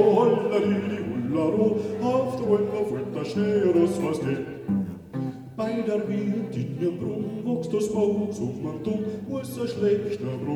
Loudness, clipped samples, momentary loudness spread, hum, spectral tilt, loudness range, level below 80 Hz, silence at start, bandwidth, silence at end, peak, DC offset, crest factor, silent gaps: -26 LUFS; under 0.1%; 9 LU; none; -7.5 dB/octave; 4 LU; -60 dBFS; 0 s; 13.5 kHz; 0 s; -8 dBFS; under 0.1%; 16 dB; none